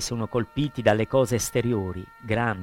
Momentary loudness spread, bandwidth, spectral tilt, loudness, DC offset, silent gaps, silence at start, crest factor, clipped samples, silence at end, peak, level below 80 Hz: 7 LU; 16.5 kHz; -5 dB/octave; -25 LUFS; under 0.1%; none; 0 s; 18 dB; under 0.1%; 0 s; -8 dBFS; -48 dBFS